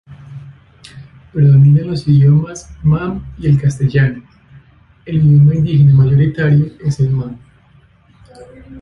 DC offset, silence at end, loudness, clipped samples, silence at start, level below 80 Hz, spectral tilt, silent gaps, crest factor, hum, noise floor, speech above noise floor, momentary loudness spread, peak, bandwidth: under 0.1%; 0 s; -12 LUFS; under 0.1%; 0.1 s; -38 dBFS; -8.5 dB/octave; none; 12 dB; none; -48 dBFS; 37 dB; 15 LU; -2 dBFS; 7.2 kHz